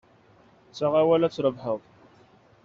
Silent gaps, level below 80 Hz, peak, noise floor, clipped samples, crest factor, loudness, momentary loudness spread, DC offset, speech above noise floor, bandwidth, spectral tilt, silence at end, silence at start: none; -66 dBFS; -10 dBFS; -57 dBFS; under 0.1%; 18 dB; -25 LUFS; 13 LU; under 0.1%; 34 dB; 7.4 kHz; -6 dB/octave; 0.85 s; 0.75 s